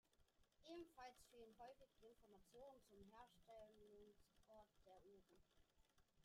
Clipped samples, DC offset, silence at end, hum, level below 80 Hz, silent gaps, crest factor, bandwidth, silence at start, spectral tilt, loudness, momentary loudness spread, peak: under 0.1%; under 0.1%; 0 s; none; -82 dBFS; none; 18 dB; 15 kHz; 0.05 s; -4.5 dB/octave; -65 LUFS; 7 LU; -50 dBFS